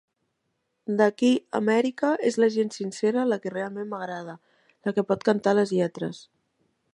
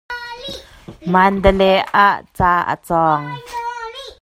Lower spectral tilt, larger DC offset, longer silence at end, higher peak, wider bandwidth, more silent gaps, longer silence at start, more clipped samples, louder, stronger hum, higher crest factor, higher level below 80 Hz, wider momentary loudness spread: about the same, -6 dB/octave vs -6 dB/octave; neither; first, 0.75 s vs 0.1 s; second, -8 dBFS vs 0 dBFS; second, 11.5 kHz vs 15.5 kHz; neither; first, 0.9 s vs 0.1 s; neither; second, -25 LUFS vs -16 LUFS; neither; about the same, 18 dB vs 16 dB; second, -74 dBFS vs -34 dBFS; second, 12 LU vs 17 LU